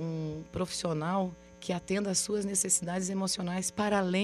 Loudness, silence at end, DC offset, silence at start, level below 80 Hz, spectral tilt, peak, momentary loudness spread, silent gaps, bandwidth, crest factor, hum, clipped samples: -31 LUFS; 0 s; under 0.1%; 0 s; -60 dBFS; -4 dB/octave; -14 dBFS; 9 LU; none; 14 kHz; 18 dB; none; under 0.1%